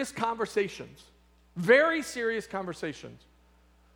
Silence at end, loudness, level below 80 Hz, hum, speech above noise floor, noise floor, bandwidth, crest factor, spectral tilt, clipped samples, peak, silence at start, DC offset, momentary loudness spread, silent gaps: 0.8 s; -28 LUFS; -62 dBFS; none; 32 dB; -61 dBFS; 17.5 kHz; 22 dB; -4.5 dB/octave; under 0.1%; -8 dBFS; 0 s; under 0.1%; 23 LU; none